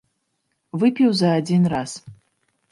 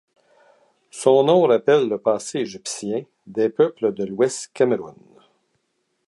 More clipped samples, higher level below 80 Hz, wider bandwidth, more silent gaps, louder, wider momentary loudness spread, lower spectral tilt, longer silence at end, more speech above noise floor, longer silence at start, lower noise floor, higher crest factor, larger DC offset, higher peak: neither; first, -58 dBFS vs -70 dBFS; about the same, 11.5 kHz vs 11.5 kHz; neither; about the same, -19 LUFS vs -20 LUFS; first, 16 LU vs 13 LU; first, -6.5 dB/octave vs -5 dB/octave; second, 0.6 s vs 1.15 s; about the same, 54 dB vs 52 dB; second, 0.75 s vs 0.95 s; about the same, -73 dBFS vs -72 dBFS; second, 14 dB vs 20 dB; neither; second, -6 dBFS vs -2 dBFS